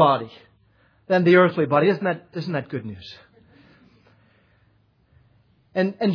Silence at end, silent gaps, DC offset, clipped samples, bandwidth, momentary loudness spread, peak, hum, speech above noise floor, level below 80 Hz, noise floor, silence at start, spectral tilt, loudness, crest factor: 0 s; none; under 0.1%; under 0.1%; 5.4 kHz; 21 LU; -2 dBFS; none; 41 dB; -68 dBFS; -61 dBFS; 0 s; -8.5 dB/octave; -21 LUFS; 20 dB